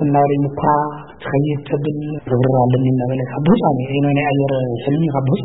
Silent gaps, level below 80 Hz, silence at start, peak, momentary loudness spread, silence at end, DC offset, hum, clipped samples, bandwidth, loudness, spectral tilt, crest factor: none; -48 dBFS; 0 s; -2 dBFS; 6 LU; 0 s; 0.5%; none; under 0.1%; 4 kHz; -17 LUFS; -13.5 dB/octave; 14 dB